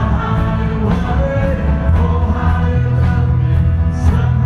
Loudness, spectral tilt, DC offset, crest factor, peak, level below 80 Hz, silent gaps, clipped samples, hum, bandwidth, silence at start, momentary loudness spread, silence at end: -15 LUFS; -9 dB/octave; under 0.1%; 12 dB; -2 dBFS; -18 dBFS; none; under 0.1%; none; 6.6 kHz; 0 s; 2 LU; 0 s